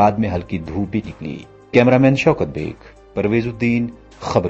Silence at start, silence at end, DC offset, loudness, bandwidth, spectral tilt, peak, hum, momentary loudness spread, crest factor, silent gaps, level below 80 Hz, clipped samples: 0 s; 0 s; under 0.1%; -18 LUFS; 8 kHz; -7.5 dB/octave; 0 dBFS; none; 17 LU; 18 dB; none; -42 dBFS; under 0.1%